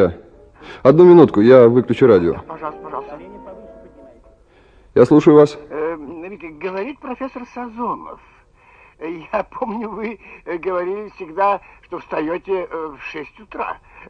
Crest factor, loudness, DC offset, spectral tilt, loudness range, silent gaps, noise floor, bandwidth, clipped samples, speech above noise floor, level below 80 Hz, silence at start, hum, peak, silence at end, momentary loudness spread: 18 dB; -15 LUFS; under 0.1%; -8.5 dB/octave; 15 LU; none; -50 dBFS; 7.6 kHz; under 0.1%; 34 dB; -50 dBFS; 0 s; none; 0 dBFS; 0.35 s; 23 LU